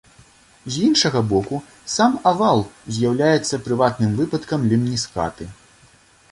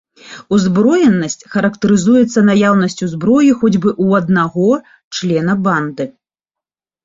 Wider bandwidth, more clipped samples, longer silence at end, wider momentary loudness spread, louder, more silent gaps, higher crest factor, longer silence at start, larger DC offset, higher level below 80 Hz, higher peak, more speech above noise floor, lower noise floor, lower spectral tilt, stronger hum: first, 11.5 kHz vs 7.8 kHz; neither; second, 0.8 s vs 0.95 s; first, 12 LU vs 8 LU; second, -20 LUFS vs -13 LUFS; second, none vs 5.04-5.11 s; first, 18 dB vs 12 dB; first, 0.65 s vs 0.25 s; neither; about the same, -50 dBFS vs -52 dBFS; about the same, -2 dBFS vs -2 dBFS; second, 33 dB vs 74 dB; second, -52 dBFS vs -86 dBFS; about the same, -5 dB/octave vs -6 dB/octave; neither